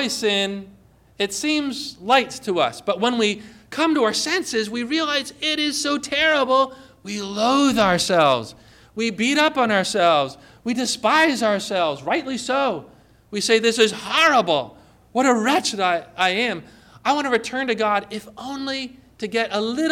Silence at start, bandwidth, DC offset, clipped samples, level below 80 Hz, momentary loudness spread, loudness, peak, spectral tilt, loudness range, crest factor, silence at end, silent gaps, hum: 0 s; 17 kHz; under 0.1%; under 0.1%; -58 dBFS; 12 LU; -20 LUFS; -6 dBFS; -3 dB/octave; 3 LU; 16 dB; 0 s; none; none